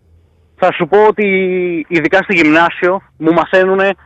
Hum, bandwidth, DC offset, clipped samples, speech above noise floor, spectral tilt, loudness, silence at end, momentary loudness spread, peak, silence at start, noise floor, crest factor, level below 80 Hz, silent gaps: none; 8.2 kHz; under 0.1%; under 0.1%; 37 dB; -6.5 dB/octave; -12 LUFS; 0.1 s; 6 LU; -2 dBFS; 0.6 s; -49 dBFS; 12 dB; -50 dBFS; none